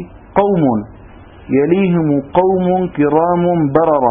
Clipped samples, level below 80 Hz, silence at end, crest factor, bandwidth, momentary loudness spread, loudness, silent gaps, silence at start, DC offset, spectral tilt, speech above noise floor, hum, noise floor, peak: under 0.1%; -42 dBFS; 0 s; 14 dB; 3.7 kHz; 5 LU; -14 LUFS; none; 0 s; under 0.1%; -12.5 dB/octave; 25 dB; none; -38 dBFS; 0 dBFS